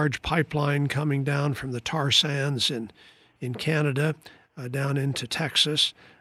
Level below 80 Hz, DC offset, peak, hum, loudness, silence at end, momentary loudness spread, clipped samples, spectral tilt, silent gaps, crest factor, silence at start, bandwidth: -54 dBFS; under 0.1%; -8 dBFS; none; -25 LUFS; 0.3 s; 13 LU; under 0.1%; -4.5 dB/octave; none; 18 dB; 0 s; 13.5 kHz